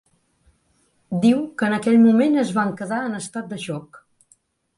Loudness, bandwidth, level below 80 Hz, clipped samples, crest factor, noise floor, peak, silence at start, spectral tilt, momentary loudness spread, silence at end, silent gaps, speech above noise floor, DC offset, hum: -20 LUFS; 11.5 kHz; -64 dBFS; under 0.1%; 16 dB; -64 dBFS; -6 dBFS; 1.1 s; -6 dB/octave; 15 LU; 0.8 s; none; 45 dB; under 0.1%; none